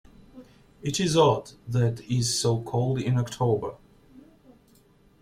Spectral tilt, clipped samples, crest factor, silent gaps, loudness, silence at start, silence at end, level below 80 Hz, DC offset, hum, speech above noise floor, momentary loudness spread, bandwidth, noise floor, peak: -5.5 dB/octave; under 0.1%; 20 dB; none; -25 LUFS; 0.35 s; 1 s; -56 dBFS; under 0.1%; none; 34 dB; 10 LU; 15 kHz; -59 dBFS; -8 dBFS